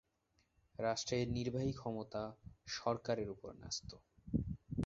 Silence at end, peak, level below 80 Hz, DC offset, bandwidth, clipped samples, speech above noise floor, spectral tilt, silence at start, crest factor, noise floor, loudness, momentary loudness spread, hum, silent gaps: 0 s; -22 dBFS; -58 dBFS; under 0.1%; 7.6 kHz; under 0.1%; 38 dB; -5.5 dB/octave; 0.8 s; 20 dB; -79 dBFS; -42 LUFS; 13 LU; none; none